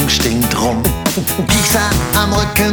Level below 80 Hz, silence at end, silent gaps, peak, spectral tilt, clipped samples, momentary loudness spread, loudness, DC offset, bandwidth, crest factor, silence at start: -24 dBFS; 0 s; none; 0 dBFS; -3.5 dB/octave; under 0.1%; 4 LU; -14 LUFS; under 0.1%; over 20 kHz; 14 dB; 0 s